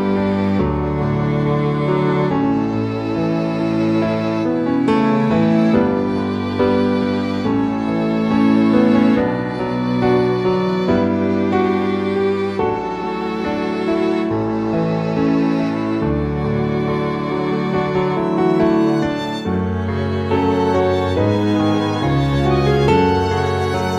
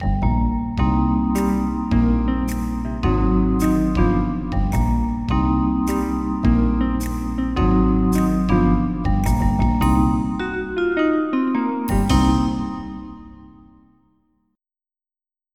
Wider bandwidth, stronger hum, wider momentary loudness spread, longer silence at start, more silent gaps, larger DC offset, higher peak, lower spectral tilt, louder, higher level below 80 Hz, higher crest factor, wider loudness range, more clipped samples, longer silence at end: second, 10 kHz vs 15.5 kHz; neither; about the same, 6 LU vs 7 LU; about the same, 0 s vs 0 s; neither; second, under 0.1% vs 0.5%; about the same, -2 dBFS vs -4 dBFS; about the same, -8 dB/octave vs -7.5 dB/octave; first, -17 LUFS vs -20 LUFS; second, -38 dBFS vs -24 dBFS; about the same, 16 dB vs 16 dB; about the same, 3 LU vs 4 LU; neither; second, 0 s vs 2.05 s